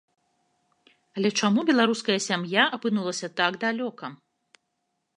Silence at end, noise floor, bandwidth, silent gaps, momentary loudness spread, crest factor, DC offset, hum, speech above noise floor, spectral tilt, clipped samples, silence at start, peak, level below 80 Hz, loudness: 1 s; -78 dBFS; 11 kHz; none; 12 LU; 22 dB; under 0.1%; none; 53 dB; -4 dB/octave; under 0.1%; 1.15 s; -4 dBFS; -78 dBFS; -24 LUFS